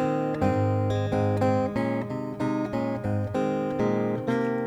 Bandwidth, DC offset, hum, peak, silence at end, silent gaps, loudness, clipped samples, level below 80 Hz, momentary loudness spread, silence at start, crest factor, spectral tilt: 10 kHz; under 0.1%; none; -10 dBFS; 0 s; none; -27 LUFS; under 0.1%; -52 dBFS; 5 LU; 0 s; 16 dB; -8.5 dB/octave